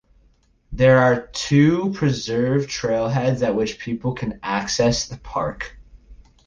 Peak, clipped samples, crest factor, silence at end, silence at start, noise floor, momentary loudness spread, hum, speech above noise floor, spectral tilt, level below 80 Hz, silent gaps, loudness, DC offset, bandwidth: -4 dBFS; under 0.1%; 16 dB; 0.3 s; 0.7 s; -58 dBFS; 11 LU; none; 39 dB; -5.5 dB/octave; -44 dBFS; none; -20 LUFS; under 0.1%; 9.8 kHz